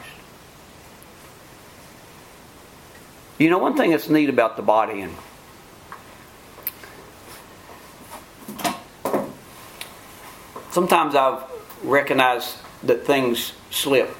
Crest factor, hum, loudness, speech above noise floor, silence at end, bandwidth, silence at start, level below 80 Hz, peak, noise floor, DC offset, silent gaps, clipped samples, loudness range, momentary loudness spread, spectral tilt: 24 dB; none; -21 LUFS; 26 dB; 0 s; 17 kHz; 0 s; -58 dBFS; 0 dBFS; -45 dBFS; under 0.1%; none; under 0.1%; 13 LU; 26 LU; -4.5 dB/octave